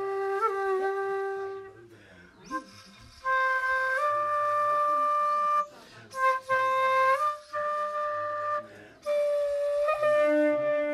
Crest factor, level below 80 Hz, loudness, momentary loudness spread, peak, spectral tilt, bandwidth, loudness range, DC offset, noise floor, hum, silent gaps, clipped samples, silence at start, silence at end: 14 dB; -68 dBFS; -27 LUFS; 13 LU; -14 dBFS; -4 dB/octave; 13.5 kHz; 5 LU; under 0.1%; -53 dBFS; none; none; under 0.1%; 0 s; 0 s